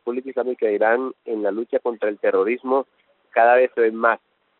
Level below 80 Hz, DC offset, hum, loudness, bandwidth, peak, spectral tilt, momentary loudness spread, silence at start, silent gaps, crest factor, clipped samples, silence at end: -74 dBFS; under 0.1%; none; -21 LUFS; 4.2 kHz; -4 dBFS; -3 dB/octave; 10 LU; 0.05 s; none; 18 dB; under 0.1%; 0.45 s